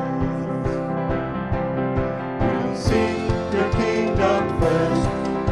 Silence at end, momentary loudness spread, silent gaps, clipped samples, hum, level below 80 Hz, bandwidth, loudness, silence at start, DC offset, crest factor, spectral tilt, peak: 0 s; 5 LU; none; under 0.1%; none; -34 dBFS; 12 kHz; -22 LUFS; 0 s; under 0.1%; 16 dB; -7 dB/octave; -4 dBFS